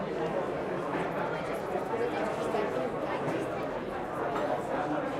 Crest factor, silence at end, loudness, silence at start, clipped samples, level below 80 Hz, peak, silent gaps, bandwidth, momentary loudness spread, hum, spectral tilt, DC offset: 14 dB; 0 s; -32 LUFS; 0 s; under 0.1%; -58 dBFS; -18 dBFS; none; 15.5 kHz; 3 LU; none; -6.5 dB/octave; under 0.1%